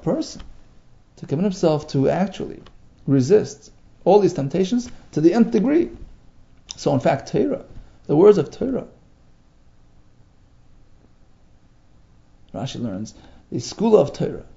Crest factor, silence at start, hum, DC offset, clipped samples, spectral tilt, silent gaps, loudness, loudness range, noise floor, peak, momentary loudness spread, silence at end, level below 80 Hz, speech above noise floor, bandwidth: 22 dB; 0 s; none; under 0.1%; under 0.1%; -7 dB/octave; none; -20 LUFS; 15 LU; -52 dBFS; 0 dBFS; 17 LU; 0.15 s; -48 dBFS; 32 dB; 7.8 kHz